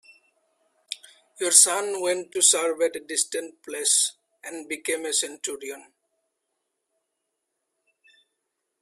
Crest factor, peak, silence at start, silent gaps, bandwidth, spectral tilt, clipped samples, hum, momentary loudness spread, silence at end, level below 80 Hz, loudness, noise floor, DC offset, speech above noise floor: 26 dB; -2 dBFS; 0.9 s; none; 16 kHz; 1 dB/octave; under 0.1%; none; 21 LU; 3 s; -80 dBFS; -22 LUFS; -80 dBFS; under 0.1%; 56 dB